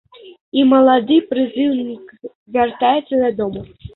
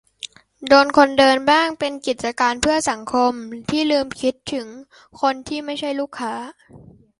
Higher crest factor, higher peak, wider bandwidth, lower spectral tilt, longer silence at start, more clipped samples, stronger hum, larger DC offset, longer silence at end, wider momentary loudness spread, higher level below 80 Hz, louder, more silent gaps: second, 14 dB vs 20 dB; about the same, -2 dBFS vs 0 dBFS; second, 4.1 kHz vs 11.5 kHz; first, -10.5 dB/octave vs -3 dB/octave; about the same, 0.25 s vs 0.25 s; neither; neither; neither; second, 0.1 s vs 0.45 s; about the same, 16 LU vs 18 LU; about the same, -52 dBFS vs -52 dBFS; first, -16 LUFS vs -19 LUFS; first, 0.41-0.52 s, 2.35-2.46 s vs none